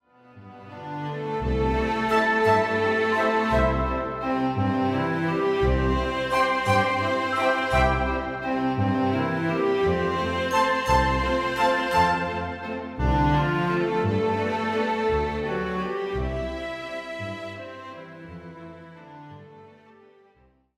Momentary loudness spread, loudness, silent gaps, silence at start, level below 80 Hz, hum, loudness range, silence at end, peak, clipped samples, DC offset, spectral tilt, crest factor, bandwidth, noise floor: 17 LU; -24 LUFS; none; 0.35 s; -36 dBFS; none; 10 LU; 1.05 s; -10 dBFS; under 0.1%; under 0.1%; -6.5 dB/octave; 16 dB; 15 kHz; -61 dBFS